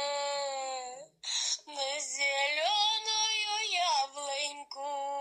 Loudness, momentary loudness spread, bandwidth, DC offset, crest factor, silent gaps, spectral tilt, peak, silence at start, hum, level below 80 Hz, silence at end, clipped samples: -31 LUFS; 11 LU; 14 kHz; under 0.1%; 16 dB; none; 3 dB/octave; -18 dBFS; 0 s; none; -88 dBFS; 0 s; under 0.1%